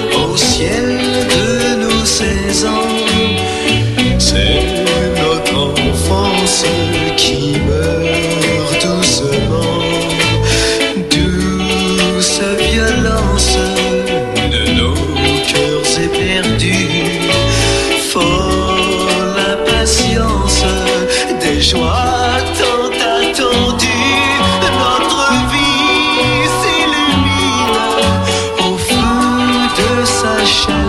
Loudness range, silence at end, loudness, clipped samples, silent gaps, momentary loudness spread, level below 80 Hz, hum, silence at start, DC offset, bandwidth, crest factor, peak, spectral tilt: 2 LU; 0 s; -12 LUFS; under 0.1%; none; 3 LU; -24 dBFS; none; 0 s; under 0.1%; 14 kHz; 12 dB; 0 dBFS; -3.5 dB/octave